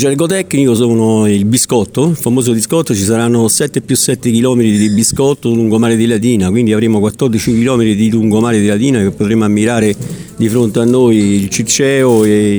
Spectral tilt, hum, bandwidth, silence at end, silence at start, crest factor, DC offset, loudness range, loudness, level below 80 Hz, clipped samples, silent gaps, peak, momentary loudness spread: -5 dB/octave; none; over 20 kHz; 0 s; 0 s; 10 dB; under 0.1%; 1 LU; -11 LUFS; -44 dBFS; under 0.1%; none; 0 dBFS; 4 LU